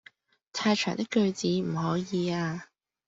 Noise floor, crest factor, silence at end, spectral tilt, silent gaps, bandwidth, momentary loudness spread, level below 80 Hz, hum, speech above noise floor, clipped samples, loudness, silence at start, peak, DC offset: -59 dBFS; 18 dB; 0.45 s; -5.5 dB/octave; none; 8 kHz; 7 LU; -66 dBFS; none; 31 dB; under 0.1%; -29 LUFS; 0.55 s; -12 dBFS; under 0.1%